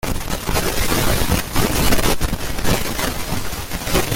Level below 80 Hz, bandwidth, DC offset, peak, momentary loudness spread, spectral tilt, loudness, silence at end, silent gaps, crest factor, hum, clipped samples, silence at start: -26 dBFS; 17 kHz; under 0.1%; -2 dBFS; 7 LU; -3.5 dB/octave; -20 LUFS; 0 s; none; 16 dB; none; under 0.1%; 0.05 s